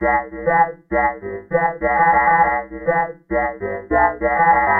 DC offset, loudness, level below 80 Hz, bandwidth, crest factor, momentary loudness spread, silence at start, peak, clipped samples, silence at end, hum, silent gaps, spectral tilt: under 0.1%; -18 LUFS; -40 dBFS; 3.3 kHz; 14 dB; 8 LU; 0 s; -4 dBFS; under 0.1%; 0 s; none; none; -10 dB/octave